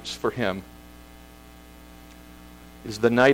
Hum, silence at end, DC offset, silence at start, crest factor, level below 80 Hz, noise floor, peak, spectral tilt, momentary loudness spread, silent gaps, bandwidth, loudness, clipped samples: 60 Hz at -50 dBFS; 0 s; under 0.1%; 0 s; 20 dB; -50 dBFS; -47 dBFS; -6 dBFS; -5 dB/octave; 24 LU; none; 16.5 kHz; -25 LUFS; under 0.1%